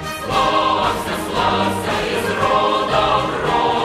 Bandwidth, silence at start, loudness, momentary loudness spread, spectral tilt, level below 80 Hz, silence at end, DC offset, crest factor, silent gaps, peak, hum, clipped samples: 16 kHz; 0 s; -18 LUFS; 4 LU; -4.5 dB/octave; -40 dBFS; 0 s; under 0.1%; 14 dB; none; -4 dBFS; none; under 0.1%